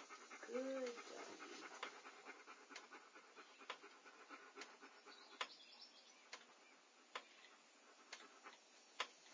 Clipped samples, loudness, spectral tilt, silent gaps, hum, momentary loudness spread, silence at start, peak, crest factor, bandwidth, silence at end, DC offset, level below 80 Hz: under 0.1%; -55 LUFS; -0.5 dB/octave; none; none; 15 LU; 0 s; -28 dBFS; 28 dB; 7.8 kHz; 0 s; under 0.1%; under -90 dBFS